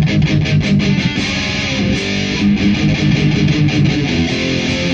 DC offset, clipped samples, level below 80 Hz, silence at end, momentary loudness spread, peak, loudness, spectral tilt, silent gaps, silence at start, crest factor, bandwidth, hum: under 0.1%; under 0.1%; -30 dBFS; 0 s; 3 LU; -2 dBFS; -14 LUFS; -5.5 dB/octave; none; 0 s; 12 dB; 8 kHz; none